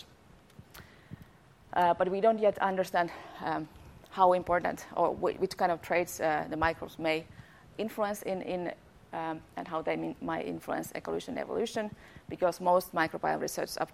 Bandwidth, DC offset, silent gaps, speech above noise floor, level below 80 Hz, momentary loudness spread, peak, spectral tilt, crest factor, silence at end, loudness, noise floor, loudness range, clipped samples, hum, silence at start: 16 kHz; under 0.1%; none; 27 dB; -60 dBFS; 17 LU; -10 dBFS; -5 dB/octave; 22 dB; 0 s; -32 LUFS; -58 dBFS; 6 LU; under 0.1%; none; 0 s